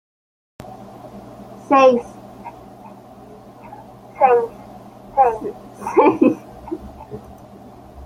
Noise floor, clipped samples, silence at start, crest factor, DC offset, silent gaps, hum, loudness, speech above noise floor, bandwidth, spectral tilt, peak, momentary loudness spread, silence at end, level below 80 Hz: -41 dBFS; under 0.1%; 0.65 s; 18 dB; under 0.1%; none; none; -17 LUFS; 26 dB; 14.5 kHz; -6.5 dB/octave; -2 dBFS; 27 LU; 0 s; -52 dBFS